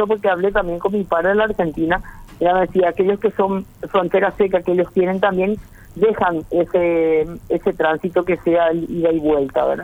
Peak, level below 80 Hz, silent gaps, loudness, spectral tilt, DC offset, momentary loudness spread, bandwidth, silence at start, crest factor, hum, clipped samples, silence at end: -2 dBFS; -42 dBFS; none; -18 LUFS; -8 dB/octave; under 0.1%; 5 LU; 15.5 kHz; 0 s; 16 dB; none; under 0.1%; 0 s